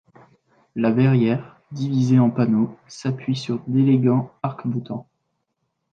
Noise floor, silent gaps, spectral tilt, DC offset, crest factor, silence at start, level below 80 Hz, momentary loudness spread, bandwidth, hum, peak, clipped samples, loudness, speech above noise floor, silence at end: -75 dBFS; none; -8.5 dB/octave; under 0.1%; 16 dB; 0.75 s; -62 dBFS; 12 LU; 7.6 kHz; none; -6 dBFS; under 0.1%; -21 LUFS; 55 dB; 0.9 s